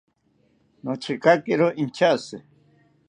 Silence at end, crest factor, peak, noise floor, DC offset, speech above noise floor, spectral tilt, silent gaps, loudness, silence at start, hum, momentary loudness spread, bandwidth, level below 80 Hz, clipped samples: 0.7 s; 22 dB; -4 dBFS; -65 dBFS; under 0.1%; 43 dB; -6 dB/octave; none; -22 LUFS; 0.85 s; none; 18 LU; 10 kHz; -70 dBFS; under 0.1%